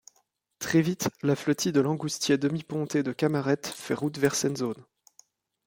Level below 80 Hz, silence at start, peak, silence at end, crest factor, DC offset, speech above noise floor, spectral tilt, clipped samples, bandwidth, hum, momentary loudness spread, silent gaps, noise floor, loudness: -68 dBFS; 0.6 s; -10 dBFS; 0.85 s; 18 dB; under 0.1%; 44 dB; -5 dB/octave; under 0.1%; 17 kHz; none; 7 LU; none; -71 dBFS; -27 LUFS